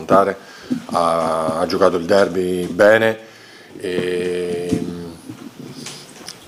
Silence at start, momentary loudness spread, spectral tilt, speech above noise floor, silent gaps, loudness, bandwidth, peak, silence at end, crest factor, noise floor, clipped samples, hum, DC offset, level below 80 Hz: 0 s; 19 LU; -5 dB/octave; 20 dB; none; -18 LUFS; 16 kHz; 0 dBFS; 0.05 s; 18 dB; -37 dBFS; under 0.1%; none; under 0.1%; -58 dBFS